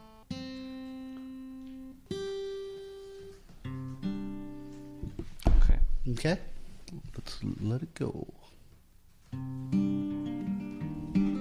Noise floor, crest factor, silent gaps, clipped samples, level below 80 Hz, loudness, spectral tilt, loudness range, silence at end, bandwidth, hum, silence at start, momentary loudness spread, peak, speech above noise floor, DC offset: -58 dBFS; 22 dB; none; under 0.1%; -34 dBFS; -36 LUFS; -7 dB/octave; 8 LU; 0 s; 10.5 kHz; none; 0 s; 16 LU; -10 dBFS; 25 dB; under 0.1%